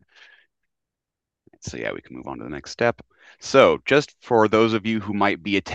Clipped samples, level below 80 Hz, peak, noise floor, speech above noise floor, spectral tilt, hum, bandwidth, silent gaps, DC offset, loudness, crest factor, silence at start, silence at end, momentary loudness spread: under 0.1%; -58 dBFS; 0 dBFS; -86 dBFS; 65 dB; -5 dB/octave; none; 8.4 kHz; none; under 0.1%; -20 LUFS; 22 dB; 1.65 s; 0 s; 19 LU